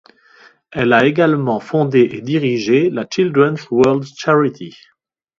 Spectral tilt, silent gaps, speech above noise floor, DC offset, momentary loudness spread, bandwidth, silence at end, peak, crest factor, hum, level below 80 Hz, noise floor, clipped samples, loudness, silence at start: -6.5 dB/octave; none; 33 dB; under 0.1%; 7 LU; 7.6 kHz; 0.7 s; 0 dBFS; 16 dB; none; -56 dBFS; -48 dBFS; under 0.1%; -15 LUFS; 0.7 s